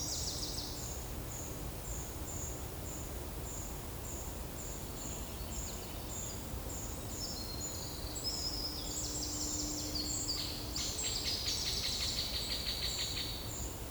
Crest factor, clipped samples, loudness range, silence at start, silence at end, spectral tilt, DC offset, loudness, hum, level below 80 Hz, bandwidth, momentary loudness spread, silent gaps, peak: 16 dB; under 0.1%; 7 LU; 0 s; 0 s; -2.5 dB/octave; under 0.1%; -38 LUFS; none; -48 dBFS; over 20 kHz; 8 LU; none; -22 dBFS